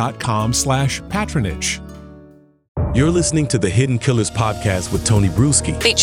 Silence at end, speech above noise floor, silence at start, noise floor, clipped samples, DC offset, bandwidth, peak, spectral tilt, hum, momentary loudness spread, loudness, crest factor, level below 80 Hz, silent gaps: 0 s; 29 dB; 0 s; -46 dBFS; under 0.1%; under 0.1%; 16.5 kHz; -2 dBFS; -4.5 dB/octave; none; 7 LU; -18 LUFS; 16 dB; -32 dBFS; 2.68-2.75 s